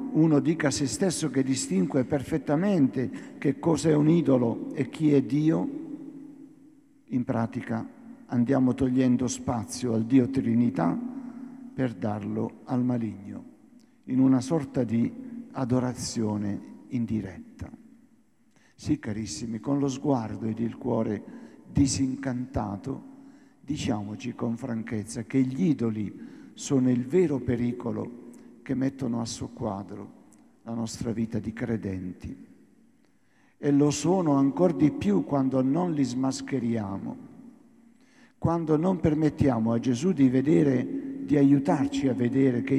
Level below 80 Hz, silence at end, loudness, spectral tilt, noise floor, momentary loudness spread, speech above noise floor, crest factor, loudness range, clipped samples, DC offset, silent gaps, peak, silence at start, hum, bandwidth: -56 dBFS; 0 s; -27 LUFS; -6.5 dB/octave; -65 dBFS; 16 LU; 39 dB; 18 dB; 8 LU; under 0.1%; under 0.1%; none; -8 dBFS; 0 s; none; 12.5 kHz